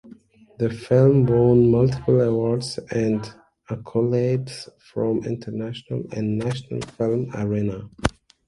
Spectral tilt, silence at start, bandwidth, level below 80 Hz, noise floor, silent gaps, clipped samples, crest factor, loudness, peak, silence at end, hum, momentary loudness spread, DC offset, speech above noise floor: -8 dB/octave; 0.05 s; 11.5 kHz; -46 dBFS; -49 dBFS; none; under 0.1%; 20 dB; -22 LUFS; 0 dBFS; 0.35 s; none; 14 LU; under 0.1%; 28 dB